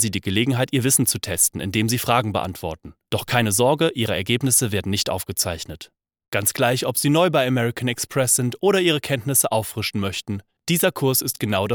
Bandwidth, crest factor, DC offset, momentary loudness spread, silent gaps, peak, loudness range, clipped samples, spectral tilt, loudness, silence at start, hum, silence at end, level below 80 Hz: over 20 kHz; 18 dB; under 0.1%; 10 LU; 6.28-6.32 s; -2 dBFS; 2 LU; under 0.1%; -3.5 dB/octave; -20 LUFS; 0 s; none; 0 s; -52 dBFS